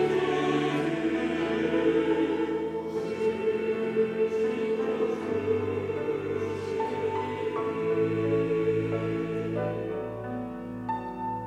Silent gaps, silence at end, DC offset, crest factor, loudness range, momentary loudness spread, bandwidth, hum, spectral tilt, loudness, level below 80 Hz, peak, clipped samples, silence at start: none; 0 s; under 0.1%; 14 dB; 2 LU; 7 LU; 9.8 kHz; none; -7 dB/octave; -29 LUFS; -60 dBFS; -14 dBFS; under 0.1%; 0 s